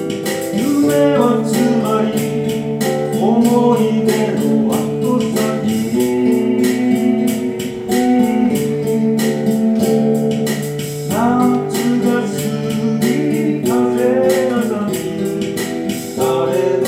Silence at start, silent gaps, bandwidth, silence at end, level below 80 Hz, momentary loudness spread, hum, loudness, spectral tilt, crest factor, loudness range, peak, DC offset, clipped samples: 0 s; none; 16.5 kHz; 0 s; -54 dBFS; 6 LU; none; -16 LUFS; -6 dB/octave; 16 dB; 2 LU; 0 dBFS; under 0.1%; under 0.1%